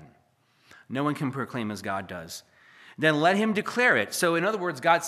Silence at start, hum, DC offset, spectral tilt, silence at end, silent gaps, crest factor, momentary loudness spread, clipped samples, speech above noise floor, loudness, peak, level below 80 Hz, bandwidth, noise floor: 0 s; none; under 0.1%; -4.5 dB/octave; 0 s; none; 22 dB; 14 LU; under 0.1%; 39 dB; -25 LUFS; -6 dBFS; -74 dBFS; 15 kHz; -65 dBFS